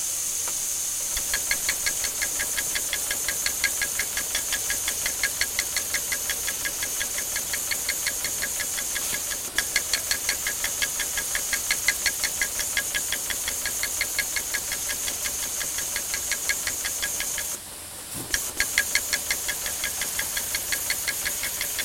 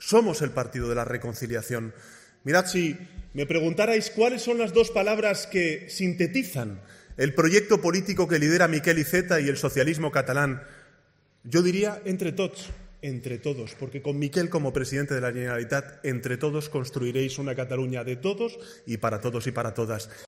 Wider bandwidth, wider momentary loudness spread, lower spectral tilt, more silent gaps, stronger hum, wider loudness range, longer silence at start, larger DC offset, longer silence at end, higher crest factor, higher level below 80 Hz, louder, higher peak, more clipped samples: about the same, 17 kHz vs 16 kHz; second, 3 LU vs 12 LU; second, 1 dB/octave vs -5 dB/octave; neither; neither; second, 2 LU vs 6 LU; about the same, 0 s vs 0 s; neither; about the same, 0 s vs 0 s; first, 26 dB vs 20 dB; about the same, -50 dBFS vs -52 dBFS; about the same, -25 LUFS vs -26 LUFS; first, -2 dBFS vs -6 dBFS; neither